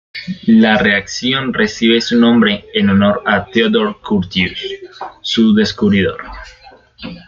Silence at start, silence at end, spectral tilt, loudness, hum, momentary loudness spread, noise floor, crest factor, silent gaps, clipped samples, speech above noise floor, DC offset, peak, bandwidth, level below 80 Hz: 0.15 s; 0.1 s; -5.5 dB/octave; -13 LUFS; none; 16 LU; -35 dBFS; 14 dB; none; under 0.1%; 22 dB; under 0.1%; 0 dBFS; 7.4 kHz; -44 dBFS